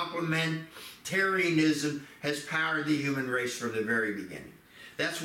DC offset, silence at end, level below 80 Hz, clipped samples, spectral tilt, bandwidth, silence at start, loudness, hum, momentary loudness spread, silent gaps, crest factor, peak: under 0.1%; 0 s; -70 dBFS; under 0.1%; -4.5 dB/octave; 16.5 kHz; 0 s; -30 LUFS; none; 16 LU; none; 16 dB; -14 dBFS